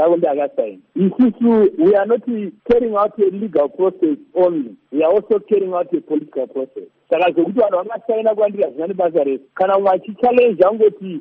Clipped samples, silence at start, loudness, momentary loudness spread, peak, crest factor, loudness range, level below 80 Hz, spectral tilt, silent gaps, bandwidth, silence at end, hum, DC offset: under 0.1%; 0 s; -17 LUFS; 10 LU; -2 dBFS; 14 dB; 3 LU; -54 dBFS; -6 dB/octave; none; 4.5 kHz; 0 s; none; under 0.1%